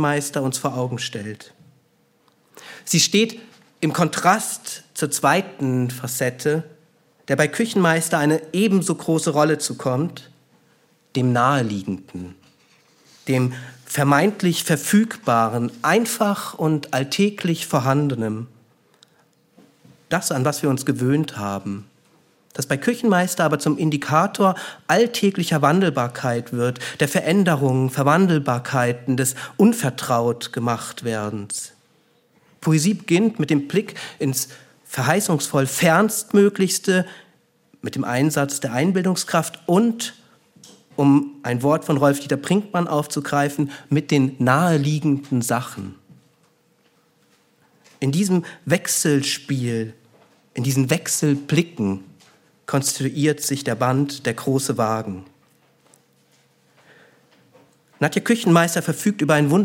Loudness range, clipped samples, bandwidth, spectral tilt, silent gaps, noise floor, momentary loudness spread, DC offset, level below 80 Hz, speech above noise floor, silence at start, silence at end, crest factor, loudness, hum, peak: 5 LU; under 0.1%; 17 kHz; -5 dB/octave; none; -61 dBFS; 11 LU; under 0.1%; -66 dBFS; 41 dB; 0 s; 0 s; 20 dB; -20 LUFS; none; -2 dBFS